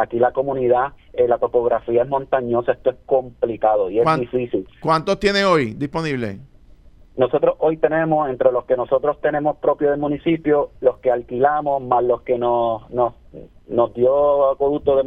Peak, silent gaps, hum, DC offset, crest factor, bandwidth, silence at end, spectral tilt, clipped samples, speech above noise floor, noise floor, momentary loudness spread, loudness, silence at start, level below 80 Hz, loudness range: -2 dBFS; none; none; under 0.1%; 18 dB; 9.8 kHz; 0 s; -7 dB/octave; under 0.1%; 27 dB; -46 dBFS; 6 LU; -19 LUFS; 0 s; -48 dBFS; 1 LU